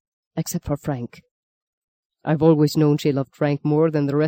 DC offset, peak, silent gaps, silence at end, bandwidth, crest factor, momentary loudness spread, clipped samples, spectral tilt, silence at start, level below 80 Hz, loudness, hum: under 0.1%; -4 dBFS; 1.31-2.10 s; 0 s; 16.5 kHz; 18 dB; 14 LU; under 0.1%; -7 dB/octave; 0.35 s; -52 dBFS; -21 LUFS; none